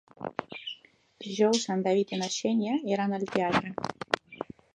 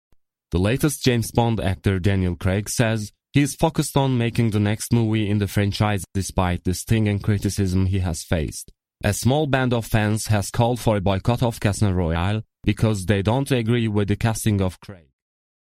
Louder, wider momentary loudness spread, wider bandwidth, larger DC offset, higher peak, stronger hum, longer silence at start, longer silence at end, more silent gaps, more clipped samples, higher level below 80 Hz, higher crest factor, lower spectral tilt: second, -29 LUFS vs -22 LUFS; first, 15 LU vs 5 LU; second, 10 kHz vs 15.5 kHz; neither; second, -6 dBFS vs -2 dBFS; neither; second, 0.2 s vs 0.5 s; second, 0.3 s vs 0.75 s; neither; neither; second, -66 dBFS vs -38 dBFS; about the same, 24 dB vs 20 dB; second, -4.5 dB/octave vs -6 dB/octave